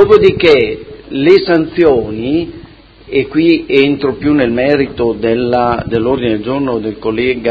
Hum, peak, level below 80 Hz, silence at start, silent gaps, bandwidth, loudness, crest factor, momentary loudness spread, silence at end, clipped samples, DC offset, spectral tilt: none; 0 dBFS; -36 dBFS; 0 s; none; 8 kHz; -12 LUFS; 12 dB; 9 LU; 0 s; 0.5%; under 0.1%; -8 dB/octave